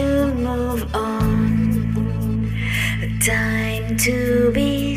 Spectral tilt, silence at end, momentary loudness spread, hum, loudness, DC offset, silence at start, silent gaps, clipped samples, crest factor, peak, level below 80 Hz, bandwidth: -5.5 dB/octave; 0 s; 5 LU; none; -20 LUFS; under 0.1%; 0 s; none; under 0.1%; 14 dB; -6 dBFS; -30 dBFS; 15.5 kHz